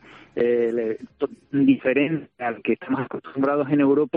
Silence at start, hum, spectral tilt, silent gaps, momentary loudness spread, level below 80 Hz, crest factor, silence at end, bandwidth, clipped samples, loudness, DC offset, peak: 0.15 s; none; -9.5 dB/octave; none; 11 LU; -66 dBFS; 16 dB; 0 s; 4.1 kHz; under 0.1%; -23 LUFS; under 0.1%; -6 dBFS